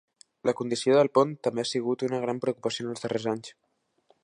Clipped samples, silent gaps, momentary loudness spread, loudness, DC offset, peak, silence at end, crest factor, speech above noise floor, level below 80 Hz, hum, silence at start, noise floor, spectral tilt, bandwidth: under 0.1%; none; 10 LU; -27 LUFS; under 0.1%; -8 dBFS; 0.7 s; 20 dB; 41 dB; -74 dBFS; none; 0.45 s; -67 dBFS; -5 dB/octave; 11 kHz